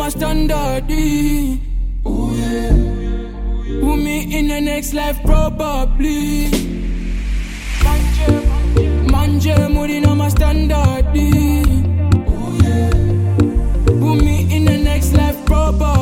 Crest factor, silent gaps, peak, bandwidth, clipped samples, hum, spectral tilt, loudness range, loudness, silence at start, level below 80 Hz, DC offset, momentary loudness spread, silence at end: 14 dB; none; 0 dBFS; 17 kHz; under 0.1%; none; -6.5 dB/octave; 4 LU; -16 LUFS; 0 s; -18 dBFS; under 0.1%; 9 LU; 0 s